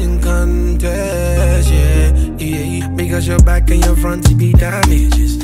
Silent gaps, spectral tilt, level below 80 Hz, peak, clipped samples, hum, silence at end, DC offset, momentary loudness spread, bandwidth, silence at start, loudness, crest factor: none; -6 dB/octave; -12 dBFS; 0 dBFS; under 0.1%; none; 0 s; under 0.1%; 7 LU; 16 kHz; 0 s; -14 LUFS; 12 dB